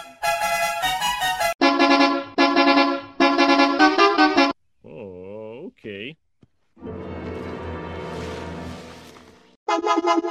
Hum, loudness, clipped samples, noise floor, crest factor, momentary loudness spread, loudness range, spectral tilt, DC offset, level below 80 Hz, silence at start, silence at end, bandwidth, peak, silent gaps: none; -19 LUFS; under 0.1%; -61 dBFS; 20 dB; 21 LU; 17 LU; -3.5 dB/octave; under 0.1%; -52 dBFS; 0 s; 0 s; 16.5 kHz; -2 dBFS; 1.55-1.59 s, 9.56-9.66 s